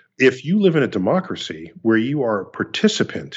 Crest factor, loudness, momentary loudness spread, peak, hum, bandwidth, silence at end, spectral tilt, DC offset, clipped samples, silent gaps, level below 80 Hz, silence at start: 18 dB; -19 LUFS; 9 LU; -2 dBFS; none; 8 kHz; 0 s; -5.5 dB/octave; under 0.1%; under 0.1%; none; -64 dBFS; 0.2 s